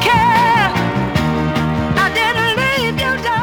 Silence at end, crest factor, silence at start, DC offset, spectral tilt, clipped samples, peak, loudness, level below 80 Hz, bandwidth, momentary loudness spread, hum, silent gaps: 0 s; 12 dB; 0 s; under 0.1%; -5 dB/octave; under 0.1%; -2 dBFS; -15 LUFS; -36 dBFS; over 20 kHz; 6 LU; none; none